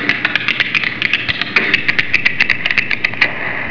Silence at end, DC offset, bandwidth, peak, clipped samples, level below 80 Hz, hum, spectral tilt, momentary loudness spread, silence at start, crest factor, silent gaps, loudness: 0 s; 5%; 5.4 kHz; 0 dBFS; 0.2%; -48 dBFS; none; -3.5 dB/octave; 3 LU; 0 s; 16 dB; none; -14 LUFS